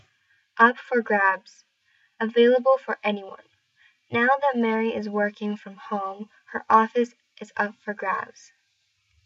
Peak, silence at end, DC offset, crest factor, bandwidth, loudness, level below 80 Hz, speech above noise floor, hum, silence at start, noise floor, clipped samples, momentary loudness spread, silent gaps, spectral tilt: -4 dBFS; 1 s; under 0.1%; 22 dB; 7.6 kHz; -23 LUFS; -78 dBFS; 47 dB; none; 0.55 s; -71 dBFS; under 0.1%; 16 LU; none; -6 dB/octave